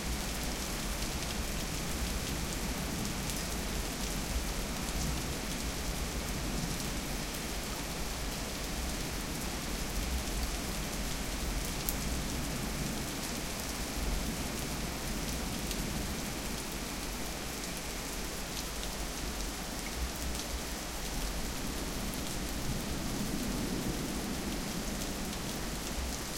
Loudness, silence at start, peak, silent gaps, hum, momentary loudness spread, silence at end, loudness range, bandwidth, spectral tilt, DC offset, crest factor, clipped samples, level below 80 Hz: -36 LUFS; 0 s; -6 dBFS; none; none; 2 LU; 0 s; 2 LU; 17 kHz; -3.5 dB/octave; under 0.1%; 30 dB; under 0.1%; -40 dBFS